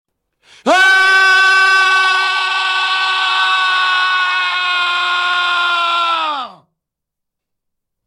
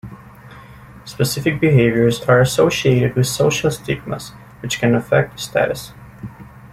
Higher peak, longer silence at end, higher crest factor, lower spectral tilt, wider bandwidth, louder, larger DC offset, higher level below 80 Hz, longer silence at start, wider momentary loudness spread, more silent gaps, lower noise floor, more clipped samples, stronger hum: about the same, 0 dBFS vs -2 dBFS; first, 1.55 s vs 0.05 s; about the same, 14 dB vs 16 dB; second, 0.5 dB/octave vs -5.5 dB/octave; second, 13.5 kHz vs 15.5 kHz; first, -12 LUFS vs -17 LUFS; neither; second, -68 dBFS vs -46 dBFS; first, 0.65 s vs 0.05 s; second, 6 LU vs 22 LU; neither; first, -79 dBFS vs -40 dBFS; neither; neither